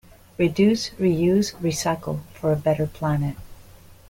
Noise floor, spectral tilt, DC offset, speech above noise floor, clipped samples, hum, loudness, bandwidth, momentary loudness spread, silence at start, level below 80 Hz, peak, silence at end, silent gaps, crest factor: -47 dBFS; -6 dB/octave; under 0.1%; 25 dB; under 0.1%; none; -23 LUFS; 17 kHz; 10 LU; 0.4 s; -48 dBFS; -8 dBFS; 0.15 s; none; 16 dB